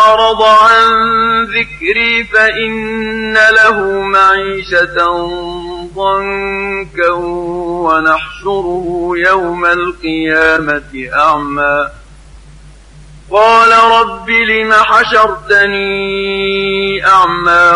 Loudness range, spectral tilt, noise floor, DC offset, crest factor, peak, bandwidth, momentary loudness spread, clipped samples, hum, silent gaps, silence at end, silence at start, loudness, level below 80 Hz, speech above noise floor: 6 LU; -4 dB/octave; -36 dBFS; under 0.1%; 10 dB; 0 dBFS; 11 kHz; 11 LU; under 0.1%; none; none; 0 s; 0 s; -10 LUFS; -36 dBFS; 25 dB